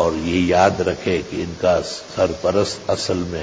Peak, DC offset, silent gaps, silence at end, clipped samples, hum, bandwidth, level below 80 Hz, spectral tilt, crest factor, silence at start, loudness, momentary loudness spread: -2 dBFS; under 0.1%; none; 0 s; under 0.1%; none; 8 kHz; -40 dBFS; -5 dB/octave; 18 dB; 0 s; -20 LUFS; 7 LU